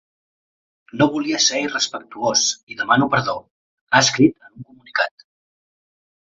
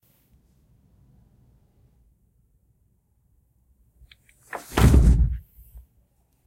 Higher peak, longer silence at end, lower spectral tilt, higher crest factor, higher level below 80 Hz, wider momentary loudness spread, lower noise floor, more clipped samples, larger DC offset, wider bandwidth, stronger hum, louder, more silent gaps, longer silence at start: about the same, -2 dBFS vs -4 dBFS; about the same, 1.15 s vs 1.05 s; second, -3 dB/octave vs -6.5 dB/octave; about the same, 20 dB vs 22 dB; second, -60 dBFS vs -28 dBFS; second, 11 LU vs 21 LU; second, -41 dBFS vs -66 dBFS; neither; neither; second, 7.8 kHz vs 16 kHz; neither; about the same, -18 LUFS vs -20 LUFS; first, 2.63-2.67 s, 3.51-3.87 s vs none; second, 0.95 s vs 4.55 s